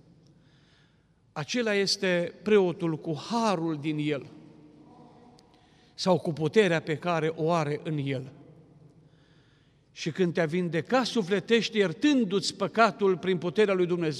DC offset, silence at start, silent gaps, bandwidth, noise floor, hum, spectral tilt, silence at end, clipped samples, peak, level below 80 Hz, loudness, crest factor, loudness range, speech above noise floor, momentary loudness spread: under 0.1%; 1.35 s; none; 12 kHz; -64 dBFS; none; -5.5 dB/octave; 0 s; under 0.1%; -8 dBFS; -72 dBFS; -27 LUFS; 20 dB; 7 LU; 37 dB; 8 LU